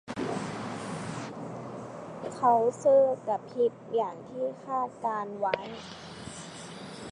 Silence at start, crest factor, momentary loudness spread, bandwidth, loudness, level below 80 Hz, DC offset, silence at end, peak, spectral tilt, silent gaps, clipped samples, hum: 0.05 s; 20 dB; 18 LU; 11 kHz; -30 LUFS; -66 dBFS; under 0.1%; 0 s; -10 dBFS; -5.5 dB/octave; none; under 0.1%; none